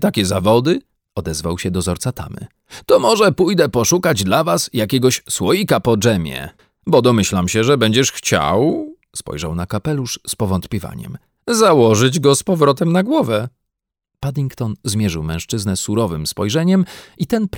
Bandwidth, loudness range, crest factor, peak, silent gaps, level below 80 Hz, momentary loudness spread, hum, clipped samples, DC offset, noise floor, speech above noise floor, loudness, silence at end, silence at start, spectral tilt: 19.5 kHz; 5 LU; 16 dB; 0 dBFS; none; -42 dBFS; 14 LU; none; under 0.1%; under 0.1%; -80 dBFS; 64 dB; -16 LUFS; 0 s; 0 s; -5 dB/octave